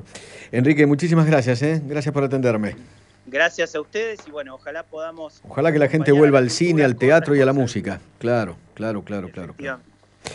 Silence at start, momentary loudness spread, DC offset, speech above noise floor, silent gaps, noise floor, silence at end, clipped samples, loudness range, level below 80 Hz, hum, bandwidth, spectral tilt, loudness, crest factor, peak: 0.15 s; 18 LU; under 0.1%; 21 dB; none; -41 dBFS; 0 s; under 0.1%; 7 LU; -58 dBFS; none; 11 kHz; -6.5 dB/octave; -19 LUFS; 18 dB; -2 dBFS